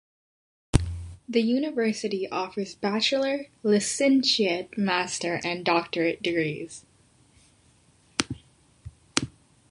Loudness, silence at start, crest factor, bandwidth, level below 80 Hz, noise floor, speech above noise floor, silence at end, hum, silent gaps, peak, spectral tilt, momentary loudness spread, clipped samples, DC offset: -26 LUFS; 0.75 s; 26 dB; 11.5 kHz; -44 dBFS; -61 dBFS; 35 dB; 0.4 s; none; none; 0 dBFS; -4 dB/octave; 12 LU; under 0.1%; under 0.1%